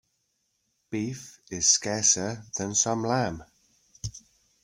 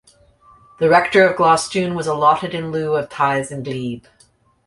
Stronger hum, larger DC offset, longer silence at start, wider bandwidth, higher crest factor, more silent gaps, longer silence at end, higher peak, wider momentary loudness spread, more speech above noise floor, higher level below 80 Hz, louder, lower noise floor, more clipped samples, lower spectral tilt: neither; neither; about the same, 0.9 s vs 0.8 s; first, 16 kHz vs 11.5 kHz; first, 24 dB vs 18 dB; neither; second, 0.45 s vs 0.7 s; second, -6 dBFS vs -2 dBFS; first, 18 LU vs 13 LU; first, 48 dB vs 39 dB; about the same, -58 dBFS vs -56 dBFS; second, -25 LUFS vs -17 LUFS; first, -75 dBFS vs -56 dBFS; neither; second, -2.5 dB/octave vs -5 dB/octave